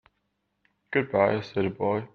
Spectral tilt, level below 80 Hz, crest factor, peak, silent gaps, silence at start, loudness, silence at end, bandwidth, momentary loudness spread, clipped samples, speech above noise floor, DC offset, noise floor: -8 dB/octave; -66 dBFS; 20 dB; -8 dBFS; none; 0.9 s; -26 LUFS; 0.1 s; 6.6 kHz; 6 LU; under 0.1%; 51 dB; under 0.1%; -77 dBFS